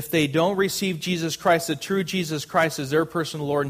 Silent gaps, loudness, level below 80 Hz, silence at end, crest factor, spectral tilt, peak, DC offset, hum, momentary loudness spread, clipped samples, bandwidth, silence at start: none; -23 LUFS; -60 dBFS; 0 s; 18 dB; -4.5 dB/octave; -6 dBFS; under 0.1%; none; 5 LU; under 0.1%; 15.5 kHz; 0 s